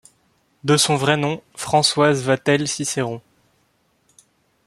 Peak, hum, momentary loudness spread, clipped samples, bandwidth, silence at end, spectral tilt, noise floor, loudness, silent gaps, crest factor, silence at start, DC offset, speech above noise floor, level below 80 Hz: -2 dBFS; none; 12 LU; under 0.1%; 14 kHz; 1.45 s; -4 dB/octave; -64 dBFS; -19 LUFS; none; 20 dB; 0.65 s; under 0.1%; 45 dB; -60 dBFS